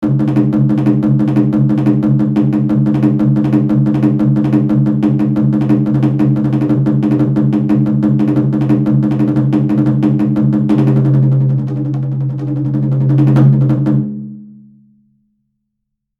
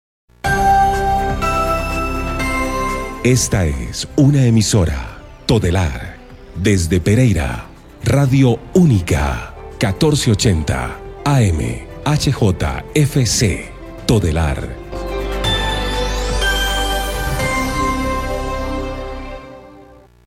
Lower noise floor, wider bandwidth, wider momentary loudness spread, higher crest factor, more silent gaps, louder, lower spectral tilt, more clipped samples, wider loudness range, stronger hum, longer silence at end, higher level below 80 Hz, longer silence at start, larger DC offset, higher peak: first, -73 dBFS vs -43 dBFS; second, 4.2 kHz vs 16 kHz; second, 5 LU vs 13 LU; about the same, 12 dB vs 14 dB; neither; first, -13 LUFS vs -17 LUFS; first, -11 dB/octave vs -5 dB/octave; neither; about the same, 2 LU vs 3 LU; neither; first, 1.65 s vs 0.4 s; second, -44 dBFS vs -26 dBFS; second, 0 s vs 0.45 s; neither; about the same, 0 dBFS vs -2 dBFS